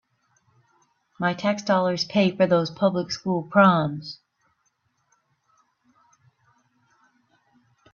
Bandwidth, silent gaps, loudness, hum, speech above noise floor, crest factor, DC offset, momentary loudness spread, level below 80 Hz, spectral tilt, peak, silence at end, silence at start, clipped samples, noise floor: 7.2 kHz; none; -22 LUFS; none; 49 dB; 22 dB; under 0.1%; 12 LU; -66 dBFS; -6 dB/octave; -4 dBFS; 3.8 s; 1.2 s; under 0.1%; -71 dBFS